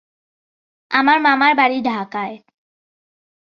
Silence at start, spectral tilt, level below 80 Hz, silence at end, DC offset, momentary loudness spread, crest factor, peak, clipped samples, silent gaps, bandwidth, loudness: 0.9 s; -5.5 dB/octave; -66 dBFS; 1.05 s; under 0.1%; 13 LU; 18 dB; -2 dBFS; under 0.1%; none; 6.6 kHz; -16 LUFS